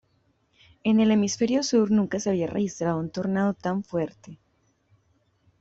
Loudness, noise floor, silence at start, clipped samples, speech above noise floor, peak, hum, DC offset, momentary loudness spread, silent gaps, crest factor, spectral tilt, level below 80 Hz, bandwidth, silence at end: -25 LUFS; -68 dBFS; 0.85 s; under 0.1%; 44 dB; -10 dBFS; none; under 0.1%; 9 LU; none; 16 dB; -5.5 dB/octave; -62 dBFS; 8 kHz; 1.25 s